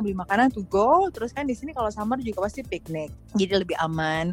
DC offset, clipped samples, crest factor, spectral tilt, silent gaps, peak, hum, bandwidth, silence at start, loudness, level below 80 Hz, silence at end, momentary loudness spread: under 0.1%; under 0.1%; 18 dB; -6 dB/octave; none; -6 dBFS; none; 16.5 kHz; 0 s; -25 LUFS; -46 dBFS; 0 s; 11 LU